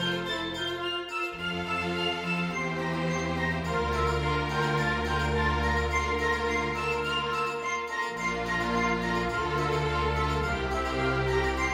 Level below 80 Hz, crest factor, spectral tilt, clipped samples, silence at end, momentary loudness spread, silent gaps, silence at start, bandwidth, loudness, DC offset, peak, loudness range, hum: -40 dBFS; 14 dB; -5 dB/octave; under 0.1%; 0 s; 4 LU; none; 0 s; 16 kHz; -28 LUFS; under 0.1%; -14 dBFS; 2 LU; none